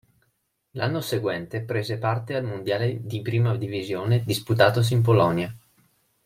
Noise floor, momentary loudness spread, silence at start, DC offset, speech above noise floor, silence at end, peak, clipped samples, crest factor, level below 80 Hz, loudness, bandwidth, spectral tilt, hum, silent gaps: -73 dBFS; 10 LU; 0.75 s; under 0.1%; 49 dB; 0.7 s; -4 dBFS; under 0.1%; 22 dB; -60 dBFS; -24 LUFS; 16 kHz; -6.5 dB/octave; none; none